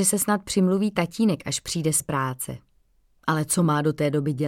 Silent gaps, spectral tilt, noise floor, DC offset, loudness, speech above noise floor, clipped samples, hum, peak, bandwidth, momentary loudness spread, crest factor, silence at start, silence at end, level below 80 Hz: none; -4.5 dB/octave; -62 dBFS; under 0.1%; -24 LUFS; 39 dB; under 0.1%; none; -8 dBFS; 17 kHz; 8 LU; 16 dB; 0 s; 0 s; -56 dBFS